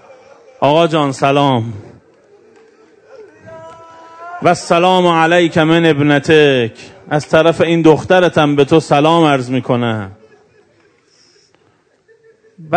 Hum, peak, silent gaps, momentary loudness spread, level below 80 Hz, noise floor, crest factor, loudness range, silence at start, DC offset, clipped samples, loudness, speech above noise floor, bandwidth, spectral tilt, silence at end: none; 0 dBFS; none; 10 LU; -52 dBFS; -55 dBFS; 14 dB; 10 LU; 0.6 s; under 0.1%; 0.4%; -12 LUFS; 44 dB; 11 kHz; -6 dB/octave; 0 s